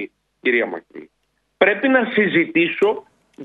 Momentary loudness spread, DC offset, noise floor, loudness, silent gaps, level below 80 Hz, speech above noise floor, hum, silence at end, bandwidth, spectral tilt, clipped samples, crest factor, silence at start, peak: 12 LU; under 0.1%; -69 dBFS; -18 LUFS; none; -66 dBFS; 51 dB; none; 0 s; 7.6 kHz; -7 dB/octave; under 0.1%; 18 dB; 0 s; -2 dBFS